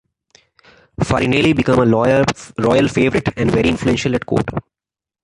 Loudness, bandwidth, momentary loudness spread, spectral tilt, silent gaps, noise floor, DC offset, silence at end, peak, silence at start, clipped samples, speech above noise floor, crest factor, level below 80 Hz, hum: -16 LUFS; 11.5 kHz; 6 LU; -6 dB/octave; none; -55 dBFS; under 0.1%; 0.65 s; -2 dBFS; 1 s; under 0.1%; 39 dB; 16 dB; -38 dBFS; none